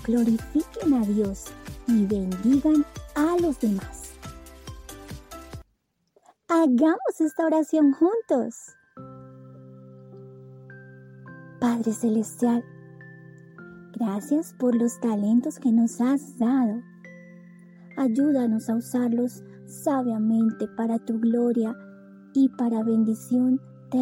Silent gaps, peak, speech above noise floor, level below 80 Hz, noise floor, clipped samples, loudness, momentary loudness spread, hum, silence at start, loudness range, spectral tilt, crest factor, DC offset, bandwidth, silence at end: none; -10 dBFS; 49 dB; -52 dBFS; -72 dBFS; under 0.1%; -24 LUFS; 23 LU; none; 0 s; 7 LU; -7 dB/octave; 14 dB; under 0.1%; 16.5 kHz; 0 s